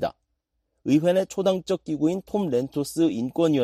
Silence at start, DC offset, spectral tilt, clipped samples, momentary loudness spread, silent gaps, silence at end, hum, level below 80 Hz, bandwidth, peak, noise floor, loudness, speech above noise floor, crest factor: 0 s; under 0.1%; -6.5 dB/octave; under 0.1%; 7 LU; none; 0 s; none; -60 dBFS; 14.5 kHz; -8 dBFS; -76 dBFS; -24 LUFS; 53 dB; 16 dB